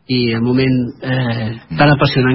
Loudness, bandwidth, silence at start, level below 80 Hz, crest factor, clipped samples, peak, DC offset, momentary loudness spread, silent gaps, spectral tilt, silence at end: -15 LUFS; 5.8 kHz; 0.1 s; -40 dBFS; 14 dB; under 0.1%; 0 dBFS; under 0.1%; 8 LU; none; -10.5 dB/octave; 0 s